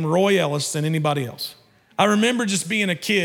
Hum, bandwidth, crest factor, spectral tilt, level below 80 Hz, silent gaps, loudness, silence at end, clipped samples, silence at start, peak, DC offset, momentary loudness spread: none; 18 kHz; 18 dB; -4.5 dB/octave; -74 dBFS; none; -21 LUFS; 0 s; under 0.1%; 0 s; -4 dBFS; under 0.1%; 12 LU